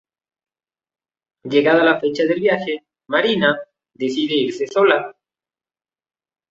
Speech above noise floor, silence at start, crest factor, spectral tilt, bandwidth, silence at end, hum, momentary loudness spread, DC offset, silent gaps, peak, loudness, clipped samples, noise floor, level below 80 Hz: over 73 dB; 1.45 s; 18 dB; -5.5 dB/octave; 7.8 kHz; 1.4 s; none; 12 LU; under 0.1%; none; -2 dBFS; -18 LUFS; under 0.1%; under -90 dBFS; -66 dBFS